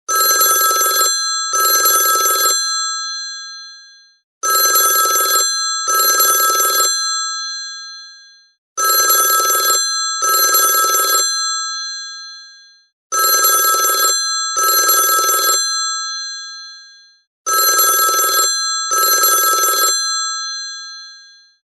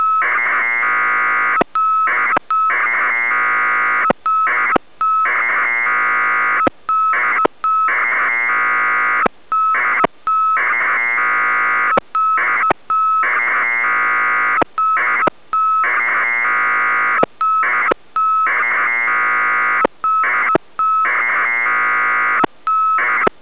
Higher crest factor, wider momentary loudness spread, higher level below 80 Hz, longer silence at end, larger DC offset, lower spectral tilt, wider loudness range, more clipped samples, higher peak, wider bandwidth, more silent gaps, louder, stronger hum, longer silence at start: about the same, 16 dB vs 16 dB; first, 15 LU vs 2 LU; second, -76 dBFS vs -58 dBFS; first, 0.6 s vs 0.15 s; second, under 0.1% vs 1%; second, 4 dB/octave vs -6.5 dB/octave; first, 3 LU vs 0 LU; neither; about the same, 0 dBFS vs 0 dBFS; first, 12.5 kHz vs 4 kHz; first, 4.24-4.41 s, 8.58-8.76 s, 12.93-13.10 s, 17.27-17.45 s vs none; about the same, -13 LUFS vs -14 LUFS; neither; about the same, 0.1 s vs 0 s